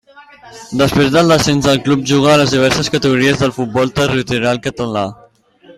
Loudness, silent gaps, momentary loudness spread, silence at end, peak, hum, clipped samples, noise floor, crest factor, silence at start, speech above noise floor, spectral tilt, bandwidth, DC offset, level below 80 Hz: -13 LUFS; none; 9 LU; 0.05 s; 0 dBFS; none; under 0.1%; -45 dBFS; 14 dB; 0.15 s; 32 dB; -5 dB/octave; 15.5 kHz; under 0.1%; -42 dBFS